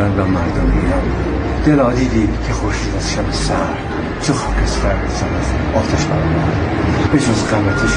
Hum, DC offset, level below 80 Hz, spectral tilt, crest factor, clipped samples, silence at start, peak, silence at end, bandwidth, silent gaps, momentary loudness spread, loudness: none; under 0.1%; -22 dBFS; -6 dB/octave; 14 dB; under 0.1%; 0 s; 0 dBFS; 0 s; 10 kHz; none; 5 LU; -16 LUFS